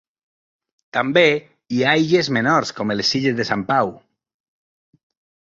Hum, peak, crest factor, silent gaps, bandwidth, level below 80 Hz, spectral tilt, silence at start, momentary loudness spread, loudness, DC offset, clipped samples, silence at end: none; -2 dBFS; 18 dB; none; 7.8 kHz; -60 dBFS; -5 dB/octave; 0.95 s; 10 LU; -18 LUFS; under 0.1%; under 0.1%; 1.45 s